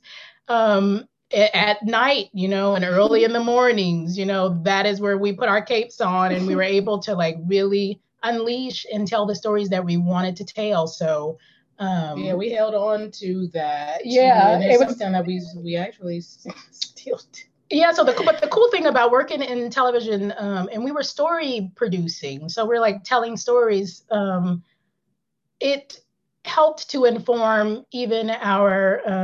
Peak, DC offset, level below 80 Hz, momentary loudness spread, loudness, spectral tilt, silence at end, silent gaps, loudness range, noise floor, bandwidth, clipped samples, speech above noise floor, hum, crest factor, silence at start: -4 dBFS; under 0.1%; -70 dBFS; 11 LU; -21 LUFS; -5.5 dB/octave; 0 s; none; 5 LU; -76 dBFS; 7.6 kHz; under 0.1%; 56 dB; none; 16 dB; 0.1 s